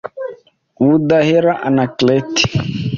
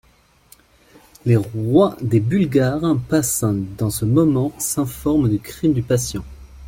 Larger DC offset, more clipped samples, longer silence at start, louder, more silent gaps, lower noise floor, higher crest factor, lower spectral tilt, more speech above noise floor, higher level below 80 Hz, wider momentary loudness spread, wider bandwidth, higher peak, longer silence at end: neither; neither; second, 0.05 s vs 1.25 s; first, -14 LUFS vs -19 LUFS; neither; second, -41 dBFS vs -52 dBFS; about the same, 14 dB vs 16 dB; about the same, -5.5 dB/octave vs -6.5 dB/octave; second, 28 dB vs 34 dB; about the same, -44 dBFS vs -42 dBFS; first, 13 LU vs 6 LU; second, 7.4 kHz vs 17 kHz; about the same, -2 dBFS vs -2 dBFS; about the same, 0 s vs 0 s